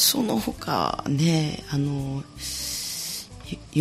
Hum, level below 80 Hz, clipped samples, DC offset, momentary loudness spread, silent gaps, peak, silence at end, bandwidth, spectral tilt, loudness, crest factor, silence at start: none; -48 dBFS; under 0.1%; under 0.1%; 10 LU; none; -8 dBFS; 0 s; 15.5 kHz; -4 dB/octave; -26 LUFS; 18 dB; 0 s